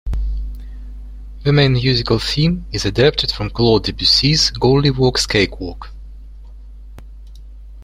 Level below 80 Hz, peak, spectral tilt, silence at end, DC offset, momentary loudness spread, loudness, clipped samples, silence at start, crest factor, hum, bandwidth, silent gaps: -28 dBFS; -2 dBFS; -5 dB/octave; 0 s; under 0.1%; 22 LU; -15 LUFS; under 0.1%; 0.05 s; 16 dB; none; 15 kHz; none